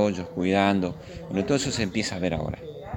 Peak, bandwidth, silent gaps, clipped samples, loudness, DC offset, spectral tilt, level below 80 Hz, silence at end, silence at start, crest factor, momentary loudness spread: -4 dBFS; 16.5 kHz; none; under 0.1%; -26 LUFS; under 0.1%; -5 dB/octave; -48 dBFS; 0 s; 0 s; 22 dB; 11 LU